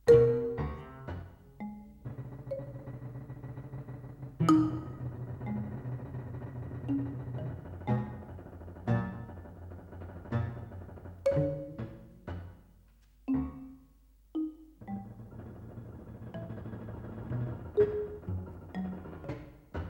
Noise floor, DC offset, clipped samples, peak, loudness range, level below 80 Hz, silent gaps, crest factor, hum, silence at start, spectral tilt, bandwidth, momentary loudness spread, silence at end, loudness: -61 dBFS; under 0.1%; under 0.1%; -10 dBFS; 9 LU; -52 dBFS; none; 24 dB; none; 0.05 s; -9 dB/octave; 16.5 kHz; 17 LU; 0 s; -35 LUFS